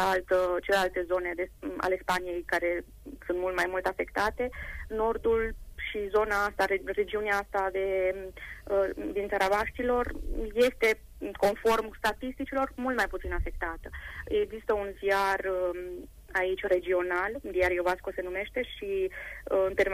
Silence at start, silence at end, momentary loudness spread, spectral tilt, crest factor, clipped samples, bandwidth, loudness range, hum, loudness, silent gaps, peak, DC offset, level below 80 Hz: 0 s; 0 s; 9 LU; -4.5 dB/octave; 16 dB; under 0.1%; 15.5 kHz; 2 LU; none; -30 LUFS; none; -14 dBFS; under 0.1%; -44 dBFS